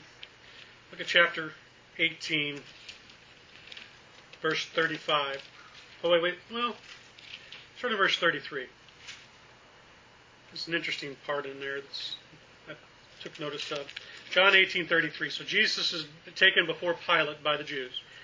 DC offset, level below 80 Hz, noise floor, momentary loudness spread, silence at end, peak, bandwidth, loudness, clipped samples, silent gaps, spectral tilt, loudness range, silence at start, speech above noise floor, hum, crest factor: under 0.1%; -72 dBFS; -56 dBFS; 24 LU; 0 s; -6 dBFS; 7.6 kHz; -28 LUFS; under 0.1%; none; -3 dB/octave; 11 LU; 0 s; 27 dB; none; 26 dB